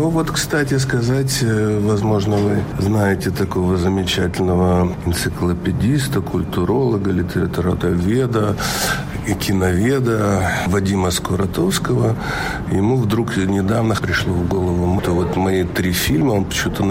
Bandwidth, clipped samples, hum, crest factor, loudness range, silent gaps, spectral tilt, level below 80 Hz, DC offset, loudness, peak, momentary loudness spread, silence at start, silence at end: 16.5 kHz; under 0.1%; none; 12 dB; 1 LU; none; -5.5 dB/octave; -34 dBFS; under 0.1%; -18 LUFS; -6 dBFS; 3 LU; 0 s; 0 s